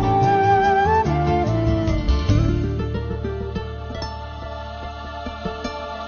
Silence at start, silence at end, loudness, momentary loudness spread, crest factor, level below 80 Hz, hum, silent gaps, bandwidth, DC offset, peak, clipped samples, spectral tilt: 0 s; 0 s; -21 LUFS; 15 LU; 16 dB; -28 dBFS; none; none; 6.8 kHz; under 0.1%; -6 dBFS; under 0.1%; -7.5 dB/octave